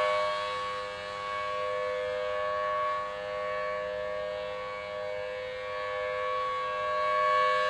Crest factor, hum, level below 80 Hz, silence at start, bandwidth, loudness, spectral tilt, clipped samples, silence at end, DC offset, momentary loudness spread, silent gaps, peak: 14 dB; none; -62 dBFS; 0 s; 11 kHz; -32 LUFS; -3 dB/octave; under 0.1%; 0 s; under 0.1%; 8 LU; none; -18 dBFS